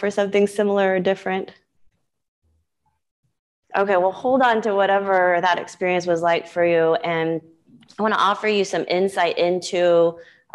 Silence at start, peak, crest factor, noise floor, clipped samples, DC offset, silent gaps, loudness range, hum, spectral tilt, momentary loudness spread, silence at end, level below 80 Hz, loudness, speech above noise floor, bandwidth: 0 s; -6 dBFS; 14 dB; -72 dBFS; under 0.1%; under 0.1%; 2.28-2.42 s, 3.11-3.23 s, 3.39-3.63 s; 7 LU; none; -5 dB/octave; 6 LU; 0.3 s; -68 dBFS; -20 LUFS; 52 dB; 12 kHz